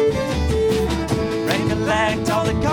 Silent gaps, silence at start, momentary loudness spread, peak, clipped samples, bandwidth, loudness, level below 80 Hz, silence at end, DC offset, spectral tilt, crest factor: none; 0 s; 3 LU; -4 dBFS; under 0.1%; 18.5 kHz; -20 LUFS; -30 dBFS; 0 s; under 0.1%; -5.5 dB/octave; 16 dB